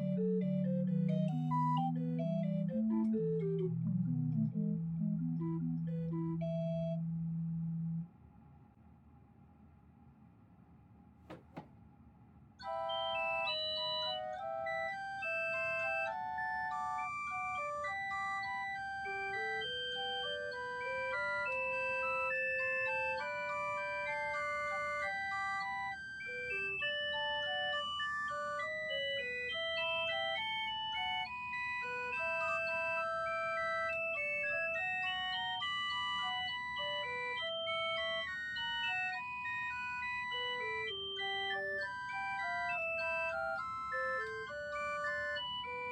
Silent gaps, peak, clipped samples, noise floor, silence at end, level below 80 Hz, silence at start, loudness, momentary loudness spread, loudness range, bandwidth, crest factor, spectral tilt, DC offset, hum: none; -24 dBFS; under 0.1%; -62 dBFS; 0 s; -68 dBFS; 0 s; -37 LUFS; 5 LU; 3 LU; 9.4 kHz; 14 dB; -6 dB/octave; under 0.1%; none